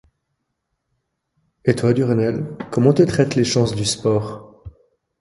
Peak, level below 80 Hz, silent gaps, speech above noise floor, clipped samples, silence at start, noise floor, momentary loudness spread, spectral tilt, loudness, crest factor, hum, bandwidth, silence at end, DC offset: 0 dBFS; -48 dBFS; none; 57 dB; under 0.1%; 1.65 s; -75 dBFS; 10 LU; -6 dB/octave; -18 LUFS; 20 dB; none; 11.5 kHz; 0.5 s; under 0.1%